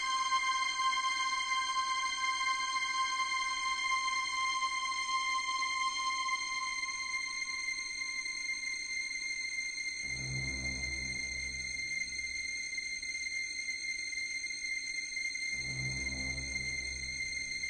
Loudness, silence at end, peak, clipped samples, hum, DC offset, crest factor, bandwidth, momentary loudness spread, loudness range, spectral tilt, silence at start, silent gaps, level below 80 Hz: -34 LUFS; 0 s; -20 dBFS; under 0.1%; none; under 0.1%; 16 dB; 10 kHz; 5 LU; 4 LU; 0 dB/octave; 0 s; none; -56 dBFS